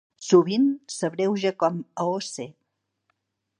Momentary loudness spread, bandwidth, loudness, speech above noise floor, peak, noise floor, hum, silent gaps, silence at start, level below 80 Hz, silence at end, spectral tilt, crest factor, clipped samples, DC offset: 13 LU; 10.5 kHz; -24 LUFS; 52 dB; -4 dBFS; -75 dBFS; none; none; 0.2 s; -78 dBFS; 1.1 s; -5.5 dB/octave; 20 dB; under 0.1%; under 0.1%